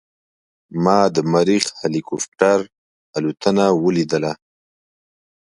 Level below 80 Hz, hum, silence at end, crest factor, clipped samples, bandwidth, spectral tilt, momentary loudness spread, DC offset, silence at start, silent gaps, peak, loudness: -60 dBFS; none; 1.1 s; 20 dB; under 0.1%; 11.5 kHz; -5 dB/octave; 11 LU; under 0.1%; 0.7 s; 2.28-2.32 s, 2.78-3.13 s; 0 dBFS; -18 LUFS